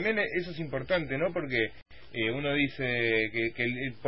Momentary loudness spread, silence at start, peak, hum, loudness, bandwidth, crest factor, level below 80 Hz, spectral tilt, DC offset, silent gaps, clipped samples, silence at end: 7 LU; 0 s; -12 dBFS; none; -30 LUFS; 5.8 kHz; 18 dB; -56 dBFS; -9.5 dB/octave; 0.5%; 1.82-1.86 s; under 0.1%; 0 s